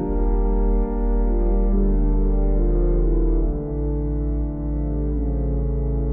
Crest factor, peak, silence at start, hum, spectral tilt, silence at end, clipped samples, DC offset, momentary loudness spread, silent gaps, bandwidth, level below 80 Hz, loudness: 10 dB; -10 dBFS; 0 s; none; -15 dB/octave; 0 s; under 0.1%; under 0.1%; 4 LU; none; 2.2 kHz; -20 dBFS; -23 LUFS